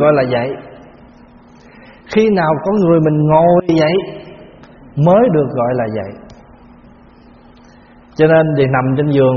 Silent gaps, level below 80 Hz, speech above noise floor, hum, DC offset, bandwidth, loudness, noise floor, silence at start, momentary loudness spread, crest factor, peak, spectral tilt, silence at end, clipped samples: none; -46 dBFS; 30 dB; none; under 0.1%; 6.8 kHz; -13 LUFS; -42 dBFS; 0 s; 15 LU; 14 dB; 0 dBFS; -7 dB/octave; 0 s; under 0.1%